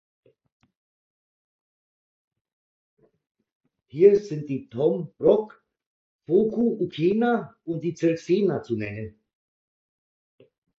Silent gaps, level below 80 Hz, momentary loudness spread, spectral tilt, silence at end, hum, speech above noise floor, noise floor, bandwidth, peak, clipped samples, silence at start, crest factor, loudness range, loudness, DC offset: 5.86-6.19 s; -64 dBFS; 15 LU; -8 dB/octave; 1.7 s; none; over 67 dB; under -90 dBFS; 7.2 kHz; -4 dBFS; under 0.1%; 3.95 s; 22 dB; 4 LU; -24 LUFS; under 0.1%